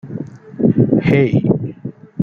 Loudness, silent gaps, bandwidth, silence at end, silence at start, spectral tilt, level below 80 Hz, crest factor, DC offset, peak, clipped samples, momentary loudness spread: -15 LUFS; none; 6.6 kHz; 0 s; 0.05 s; -10 dB/octave; -46 dBFS; 16 dB; under 0.1%; 0 dBFS; under 0.1%; 18 LU